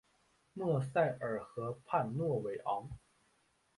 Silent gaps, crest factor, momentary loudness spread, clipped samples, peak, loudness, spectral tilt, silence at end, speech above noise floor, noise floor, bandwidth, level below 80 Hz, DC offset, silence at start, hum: none; 20 dB; 12 LU; under 0.1%; -18 dBFS; -37 LUFS; -8 dB/octave; 0.8 s; 39 dB; -75 dBFS; 11.5 kHz; -66 dBFS; under 0.1%; 0.55 s; none